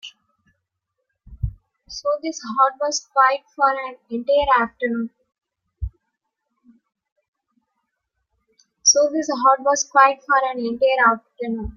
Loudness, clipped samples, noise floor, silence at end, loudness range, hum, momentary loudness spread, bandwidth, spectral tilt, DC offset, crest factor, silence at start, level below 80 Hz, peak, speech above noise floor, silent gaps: -19 LUFS; under 0.1%; -78 dBFS; 0.05 s; 8 LU; none; 16 LU; 11 kHz; -2.5 dB/octave; under 0.1%; 20 dB; 0.05 s; -44 dBFS; -2 dBFS; 59 dB; 7.12-7.16 s, 7.28-7.33 s